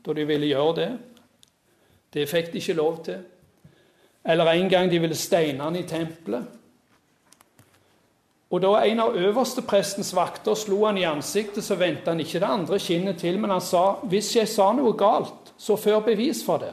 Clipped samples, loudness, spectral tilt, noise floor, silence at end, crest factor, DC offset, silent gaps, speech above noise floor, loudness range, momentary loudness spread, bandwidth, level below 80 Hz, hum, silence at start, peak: under 0.1%; -23 LUFS; -4.5 dB/octave; -65 dBFS; 0 s; 18 dB; under 0.1%; none; 42 dB; 7 LU; 10 LU; 14 kHz; -70 dBFS; none; 0.05 s; -6 dBFS